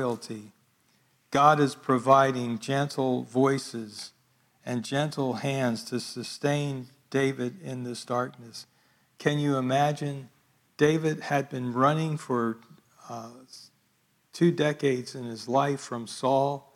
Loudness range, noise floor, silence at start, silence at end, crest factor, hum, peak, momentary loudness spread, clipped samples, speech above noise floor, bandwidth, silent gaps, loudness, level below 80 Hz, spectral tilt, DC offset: 6 LU; -69 dBFS; 0 s; 0.15 s; 24 dB; none; -6 dBFS; 19 LU; under 0.1%; 42 dB; 15.5 kHz; none; -27 LUFS; -72 dBFS; -6 dB/octave; under 0.1%